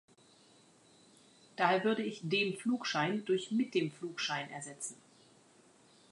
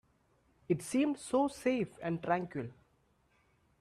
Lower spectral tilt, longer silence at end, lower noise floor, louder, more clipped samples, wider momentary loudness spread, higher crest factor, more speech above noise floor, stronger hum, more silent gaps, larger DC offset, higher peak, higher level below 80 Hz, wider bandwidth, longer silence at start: second, -4 dB/octave vs -6 dB/octave; about the same, 1.15 s vs 1.1 s; second, -64 dBFS vs -72 dBFS; about the same, -34 LUFS vs -34 LUFS; neither; about the same, 12 LU vs 10 LU; about the same, 22 dB vs 20 dB; second, 30 dB vs 39 dB; neither; neither; neither; about the same, -16 dBFS vs -16 dBFS; second, -86 dBFS vs -70 dBFS; second, 11.5 kHz vs 13.5 kHz; first, 1.6 s vs 0.7 s